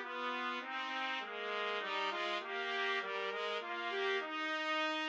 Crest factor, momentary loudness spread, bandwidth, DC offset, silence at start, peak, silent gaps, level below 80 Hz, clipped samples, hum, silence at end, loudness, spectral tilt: 16 dB; 4 LU; 8.8 kHz; under 0.1%; 0 s; -24 dBFS; none; under -90 dBFS; under 0.1%; none; 0 s; -38 LUFS; -2 dB/octave